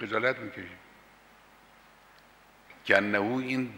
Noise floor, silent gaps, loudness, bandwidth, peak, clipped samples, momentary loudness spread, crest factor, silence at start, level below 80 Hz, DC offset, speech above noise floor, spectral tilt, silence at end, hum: -58 dBFS; none; -28 LUFS; 16 kHz; -8 dBFS; under 0.1%; 20 LU; 24 dB; 0 s; -72 dBFS; under 0.1%; 29 dB; -5.5 dB/octave; 0 s; none